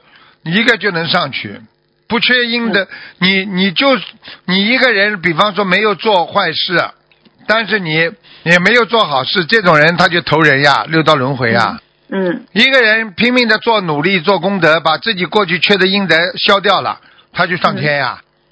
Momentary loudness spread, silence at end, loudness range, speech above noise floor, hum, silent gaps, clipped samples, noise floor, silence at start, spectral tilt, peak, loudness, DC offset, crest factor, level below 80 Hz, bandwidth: 10 LU; 0.35 s; 3 LU; 35 dB; none; none; 0.3%; -48 dBFS; 0.45 s; -5.5 dB/octave; 0 dBFS; -12 LUFS; under 0.1%; 14 dB; -54 dBFS; 8 kHz